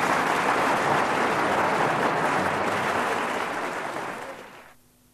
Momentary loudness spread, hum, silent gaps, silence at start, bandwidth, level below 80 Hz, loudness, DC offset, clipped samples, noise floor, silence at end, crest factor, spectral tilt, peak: 10 LU; none; none; 0 s; 14 kHz; -60 dBFS; -24 LUFS; under 0.1%; under 0.1%; -54 dBFS; 0.45 s; 16 dB; -4 dB/octave; -10 dBFS